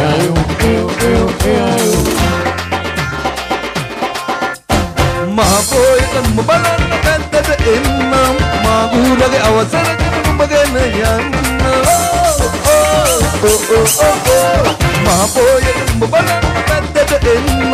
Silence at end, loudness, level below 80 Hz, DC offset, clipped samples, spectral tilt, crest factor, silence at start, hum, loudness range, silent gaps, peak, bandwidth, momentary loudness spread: 0 s; -12 LUFS; -22 dBFS; under 0.1%; under 0.1%; -4 dB/octave; 12 dB; 0 s; none; 4 LU; none; 0 dBFS; 15.5 kHz; 7 LU